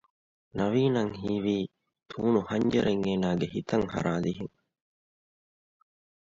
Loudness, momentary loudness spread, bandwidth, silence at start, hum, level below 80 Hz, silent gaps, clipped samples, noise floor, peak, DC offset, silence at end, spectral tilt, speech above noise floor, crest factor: -28 LUFS; 13 LU; 7.6 kHz; 0.55 s; none; -58 dBFS; none; under 0.1%; under -90 dBFS; -12 dBFS; under 0.1%; 1.8 s; -7 dB/octave; over 63 dB; 18 dB